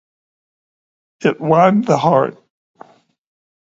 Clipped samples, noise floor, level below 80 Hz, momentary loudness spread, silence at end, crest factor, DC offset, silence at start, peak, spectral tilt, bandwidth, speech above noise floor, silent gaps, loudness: under 0.1%; -45 dBFS; -62 dBFS; 8 LU; 1.3 s; 18 dB; under 0.1%; 1.2 s; 0 dBFS; -7 dB/octave; 7.8 kHz; 32 dB; none; -15 LUFS